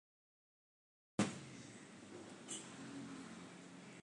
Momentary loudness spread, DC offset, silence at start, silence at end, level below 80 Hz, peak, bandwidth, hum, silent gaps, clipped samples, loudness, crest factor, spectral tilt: 14 LU; under 0.1%; 1.2 s; 0 s; -80 dBFS; -24 dBFS; 11 kHz; none; none; under 0.1%; -49 LUFS; 26 dB; -4 dB/octave